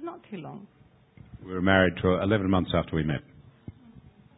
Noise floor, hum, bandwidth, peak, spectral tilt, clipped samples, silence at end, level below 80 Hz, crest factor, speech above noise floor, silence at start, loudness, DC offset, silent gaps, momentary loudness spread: -54 dBFS; none; 4 kHz; -6 dBFS; -11 dB/octave; under 0.1%; 0.4 s; -44 dBFS; 24 dB; 28 dB; 0 s; -25 LUFS; under 0.1%; none; 26 LU